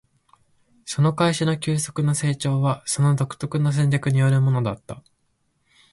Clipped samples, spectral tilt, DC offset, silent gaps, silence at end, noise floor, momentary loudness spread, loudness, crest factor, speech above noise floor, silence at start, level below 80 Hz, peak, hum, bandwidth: under 0.1%; -6 dB/octave; under 0.1%; none; 0.95 s; -69 dBFS; 11 LU; -22 LUFS; 14 dB; 48 dB; 0.85 s; -56 dBFS; -8 dBFS; none; 11.5 kHz